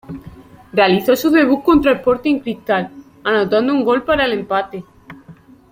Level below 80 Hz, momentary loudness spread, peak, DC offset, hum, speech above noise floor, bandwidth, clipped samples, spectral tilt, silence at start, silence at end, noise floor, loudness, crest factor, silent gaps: -44 dBFS; 14 LU; -2 dBFS; under 0.1%; none; 28 dB; 16.5 kHz; under 0.1%; -5.5 dB/octave; 0.1 s; 0.4 s; -43 dBFS; -16 LUFS; 16 dB; none